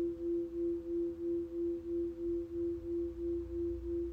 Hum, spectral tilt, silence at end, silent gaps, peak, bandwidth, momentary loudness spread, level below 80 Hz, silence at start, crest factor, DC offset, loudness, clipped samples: none; -10 dB/octave; 0 s; none; -30 dBFS; 2.8 kHz; 2 LU; -52 dBFS; 0 s; 8 dB; under 0.1%; -38 LUFS; under 0.1%